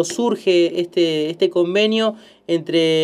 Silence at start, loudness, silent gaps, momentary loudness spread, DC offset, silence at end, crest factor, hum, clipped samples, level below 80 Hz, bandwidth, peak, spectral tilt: 0 s; -18 LUFS; none; 7 LU; under 0.1%; 0 s; 12 dB; none; under 0.1%; -72 dBFS; 12 kHz; -4 dBFS; -4.5 dB/octave